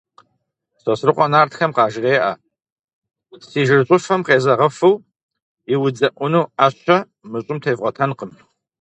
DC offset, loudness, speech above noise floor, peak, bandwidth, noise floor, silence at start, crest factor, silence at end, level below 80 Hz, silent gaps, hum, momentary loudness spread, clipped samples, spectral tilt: under 0.1%; -17 LUFS; 54 dB; 0 dBFS; 8.4 kHz; -71 dBFS; 0.85 s; 18 dB; 0.5 s; -64 dBFS; 2.72-3.02 s, 5.23-5.29 s, 5.42-5.57 s; none; 12 LU; under 0.1%; -6 dB/octave